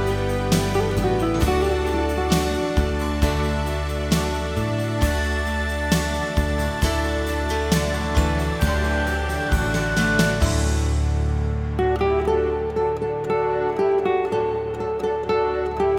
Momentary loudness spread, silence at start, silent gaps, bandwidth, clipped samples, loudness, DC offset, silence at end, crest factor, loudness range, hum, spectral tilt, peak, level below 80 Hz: 4 LU; 0 s; none; 17 kHz; under 0.1%; -22 LUFS; 0.1%; 0 s; 18 dB; 2 LU; none; -5.5 dB/octave; -4 dBFS; -28 dBFS